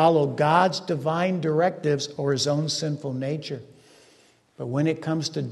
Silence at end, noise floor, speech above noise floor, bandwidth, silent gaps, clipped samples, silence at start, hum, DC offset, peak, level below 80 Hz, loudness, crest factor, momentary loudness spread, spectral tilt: 0 s; -58 dBFS; 34 dB; 12 kHz; none; under 0.1%; 0 s; none; under 0.1%; -6 dBFS; -68 dBFS; -24 LUFS; 20 dB; 10 LU; -5.5 dB/octave